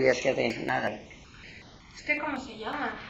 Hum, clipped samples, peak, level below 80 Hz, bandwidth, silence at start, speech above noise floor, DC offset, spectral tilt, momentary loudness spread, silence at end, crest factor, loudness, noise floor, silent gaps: none; under 0.1%; -10 dBFS; -58 dBFS; 8.2 kHz; 0 s; 19 dB; under 0.1%; -4.5 dB/octave; 21 LU; 0 s; 22 dB; -30 LUFS; -49 dBFS; none